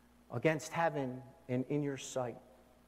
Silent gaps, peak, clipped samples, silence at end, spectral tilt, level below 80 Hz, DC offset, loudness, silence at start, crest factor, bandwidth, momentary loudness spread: none; -16 dBFS; under 0.1%; 0.45 s; -5.5 dB/octave; -72 dBFS; under 0.1%; -37 LUFS; 0.3 s; 22 dB; 16 kHz; 11 LU